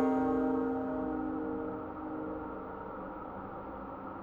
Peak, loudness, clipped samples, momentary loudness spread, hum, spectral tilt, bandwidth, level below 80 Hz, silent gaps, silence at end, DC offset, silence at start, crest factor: -20 dBFS; -37 LUFS; under 0.1%; 12 LU; none; -9.5 dB/octave; 4.1 kHz; -56 dBFS; none; 0 s; under 0.1%; 0 s; 16 dB